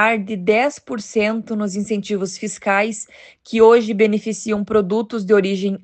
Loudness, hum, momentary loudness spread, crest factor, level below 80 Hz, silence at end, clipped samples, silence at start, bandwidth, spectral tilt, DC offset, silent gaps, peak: -18 LUFS; none; 11 LU; 16 dB; -58 dBFS; 0.05 s; under 0.1%; 0 s; 9 kHz; -5 dB/octave; under 0.1%; none; -2 dBFS